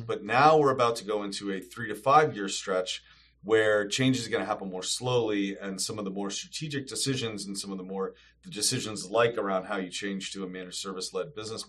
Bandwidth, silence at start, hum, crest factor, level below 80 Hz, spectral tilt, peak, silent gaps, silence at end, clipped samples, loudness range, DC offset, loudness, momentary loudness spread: 13 kHz; 0 s; none; 22 dB; -66 dBFS; -3.5 dB/octave; -8 dBFS; none; 0 s; under 0.1%; 5 LU; under 0.1%; -28 LUFS; 13 LU